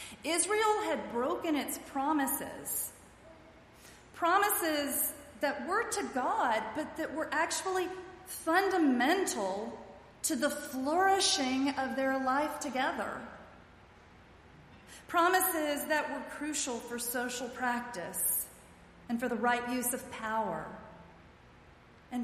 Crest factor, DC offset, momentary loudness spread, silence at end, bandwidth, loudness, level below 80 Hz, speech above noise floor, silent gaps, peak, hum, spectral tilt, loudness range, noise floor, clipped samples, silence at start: 18 dB; under 0.1%; 12 LU; 0 s; 15.5 kHz; -32 LUFS; -66 dBFS; 26 dB; none; -14 dBFS; none; -2 dB/octave; 4 LU; -58 dBFS; under 0.1%; 0 s